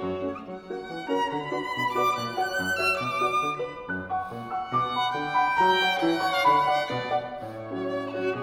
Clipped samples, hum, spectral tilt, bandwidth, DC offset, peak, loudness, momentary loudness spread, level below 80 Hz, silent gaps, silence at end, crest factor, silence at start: under 0.1%; none; -4.5 dB/octave; over 20 kHz; under 0.1%; -10 dBFS; -26 LUFS; 12 LU; -60 dBFS; none; 0 s; 18 dB; 0 s